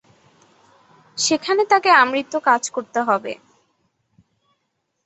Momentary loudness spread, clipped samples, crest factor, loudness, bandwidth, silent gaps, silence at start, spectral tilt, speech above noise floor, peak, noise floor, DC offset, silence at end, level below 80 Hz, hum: 15 LU; under 0.1%; 20 dB; -18 LUFS; 8.2 kHz; none; 1.15 s; -1.5 dB/octave; 55 dB; -2 dBFS; -73 dBFS; under 0.1%; 1.7 s; -72 dBFS; none